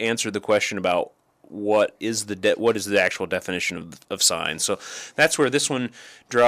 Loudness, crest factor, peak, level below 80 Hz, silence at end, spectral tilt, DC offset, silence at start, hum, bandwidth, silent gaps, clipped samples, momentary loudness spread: -22 LUFS; 18 dB; -6 dBFS; -64 dBFS; 0 s; -2.5 dB/octave; under 0.1%; 0 s; none; 15.5 kHz; none; under 0.1%; 12 LU